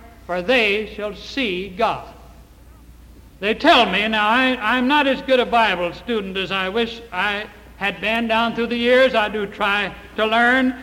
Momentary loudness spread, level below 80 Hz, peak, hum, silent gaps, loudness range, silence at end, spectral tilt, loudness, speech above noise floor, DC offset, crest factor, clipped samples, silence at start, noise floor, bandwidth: 11 LU; -46 dBFS; -4 dBFS; none; none; 5 LU; 0 s; -4.5 dB/octave; -19 LUFS; 26 dB; under 0.1%; 16 dB; under 0.1%; 0 s; -45 dBFS; 16 kHz